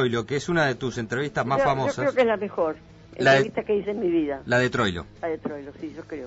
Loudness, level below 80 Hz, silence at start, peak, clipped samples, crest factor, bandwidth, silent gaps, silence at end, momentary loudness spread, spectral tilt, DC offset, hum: -24 LUFS; -52 dBFS; 0 s; -8 dBFS; under 0.1%; 16 dB; 8 kHz; none; 0 s; 14 LU; -5.5 dB/octave; under 0.1%; none